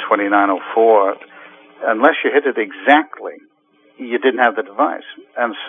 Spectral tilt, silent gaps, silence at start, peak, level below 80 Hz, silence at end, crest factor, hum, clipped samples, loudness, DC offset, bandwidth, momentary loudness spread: -6 dB/octave; none; 0 s; 0 dBFS; -84 dBFS; 0 s; 16 dB; none; under 0.1%; -16 LUFS; under 0.1%; 3.8 kHz; 18 LU